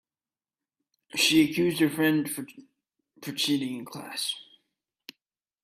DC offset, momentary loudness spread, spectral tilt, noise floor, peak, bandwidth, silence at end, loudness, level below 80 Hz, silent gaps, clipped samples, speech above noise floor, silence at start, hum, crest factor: under 0.1%; 16 LU; -3.5 dB/octave; under -90 dBFS; -10 dBFS; 16 kHz; 1.2 s; -26 LUFS; -70 dBFS; none; under 0.1%; over 64 dB; 1.15 s; none; 20 dB